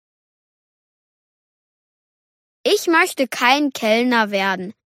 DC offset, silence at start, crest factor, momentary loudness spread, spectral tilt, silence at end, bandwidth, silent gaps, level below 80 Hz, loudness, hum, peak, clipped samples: under 0.1%; 2.65 s; 18 dB; 5 LU; -3 dB/octave; 0.15 s; 16 kHz; none; -74 dBFS; -17 LUFS; none; -2 dBFS; under 0.1%